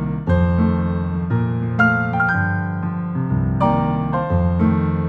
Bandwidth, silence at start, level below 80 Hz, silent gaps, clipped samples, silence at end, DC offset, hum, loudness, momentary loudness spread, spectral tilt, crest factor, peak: 5.2 kHz; 0 s; -34 dBFS; none; under 0.1%; 0 s; under 0.1%; none; -19 LUFS; 6 LU; -10 dB/octave; 14 dB; -4 dBFS